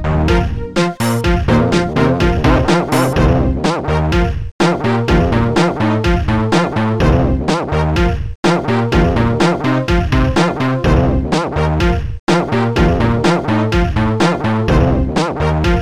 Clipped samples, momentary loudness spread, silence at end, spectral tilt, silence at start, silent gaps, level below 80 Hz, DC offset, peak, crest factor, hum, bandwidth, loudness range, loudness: under 0.1%; 3 LU; 0 s; -6.5 dB/octave; 0 s; 4.51-4.59 s, 8.35-8.43 s, 12.19-12.27 s; -22 dBFS; under 0.1%; 0 dBFS; 12 dB; none; 14.5 kHz; 1 LU; -14 LUFS